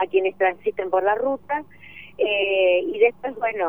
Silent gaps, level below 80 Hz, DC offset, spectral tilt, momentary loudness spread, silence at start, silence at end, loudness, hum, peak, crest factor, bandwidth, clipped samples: none; -62 dBFS; 0.3%; -6.5 dB/octave; 10 LU; 0 s; 0 s; -22 LUFS; none; -6 dBFS; 16 dB; 19.5 kHz; under 0.1%